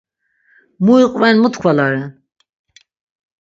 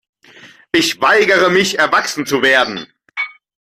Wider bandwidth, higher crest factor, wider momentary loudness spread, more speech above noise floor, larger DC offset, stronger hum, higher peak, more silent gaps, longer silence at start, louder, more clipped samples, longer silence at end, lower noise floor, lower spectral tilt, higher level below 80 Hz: second, 7.6 kHz vs 16 kHz; about the same, 16 dB vs 14 dB; second, 9 LU vs 13 LU; first, 46 dB vs 29 dB; neither; neither; about the same, 0 dBFS vs -2 dBFS; neither; first, 0.8 s vs 0.45 s; about the same, -13 LUFS vs -14 LUFS; neither; first, 1.3 s vs 0.45 s; first, -59 dBFS vs -43 dBFS; first, -6.5 dB/octave vs -3 dB/octave; about the same, -60 dBFS vs -58 dBFS